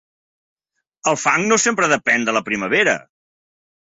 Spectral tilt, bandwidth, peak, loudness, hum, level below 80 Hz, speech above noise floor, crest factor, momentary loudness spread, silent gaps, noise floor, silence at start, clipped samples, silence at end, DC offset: -2.5 dB/octave; 8.4 kHz; -2 dBFS; -17 LUFS; none; -62 dBFS; 29 dB; 18 dB; 6 LU; none; -47 dBFS; 1.05 s; under 0.1%; 1 s; under 0.1%